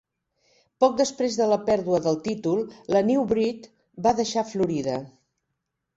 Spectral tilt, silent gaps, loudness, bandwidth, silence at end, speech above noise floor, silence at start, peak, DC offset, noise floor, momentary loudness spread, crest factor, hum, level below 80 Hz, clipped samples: -5.5 dB/octave; none; -24 LUFS; 8 kHz; 0.85 s; 57 dB; 0.8 s; -6 dBFS; under 0.1%; -80 dBFS; 7 LU; 18 dB; none; -60 dBFS; under 0.1%